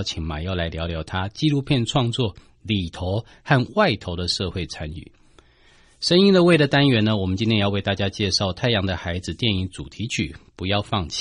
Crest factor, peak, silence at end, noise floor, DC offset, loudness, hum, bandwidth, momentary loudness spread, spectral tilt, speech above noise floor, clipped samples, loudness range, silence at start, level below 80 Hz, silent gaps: 18 dB; -4 dBFS; 0 s; -54 dBFS; under 0.1%; -22 LUFS; none; 11 kHz; 13 LU; -5.5 dB/octave; 32 dB; under 0.1%; 5 LU; 0 s; -42 dBFS; none